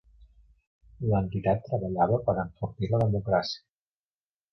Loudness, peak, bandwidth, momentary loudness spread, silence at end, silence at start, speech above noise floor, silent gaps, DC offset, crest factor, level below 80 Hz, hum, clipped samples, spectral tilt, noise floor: -28 LUFS; -12 dBFS; 6.2 kHz; 9 LU; 0.95 s; 0.2 s; over 63 dB; 0.67-0.81 s; under 0.1%; 18 dB; -50 dBFS; none; under 0.1%; -8 dB/octave; under -90 dBFS